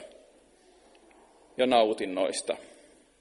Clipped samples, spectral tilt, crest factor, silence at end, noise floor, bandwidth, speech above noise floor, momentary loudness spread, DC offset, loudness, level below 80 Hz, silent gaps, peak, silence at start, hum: under 0.1%; -3 dB/octave; 22 dB; 0.55 s; -60 dBFS; 11.5 kHz; 33 dB; 14 LU; under 0.1%; -28 LUFS; -70 dBFS; none; -10 dBFS; 0 s; none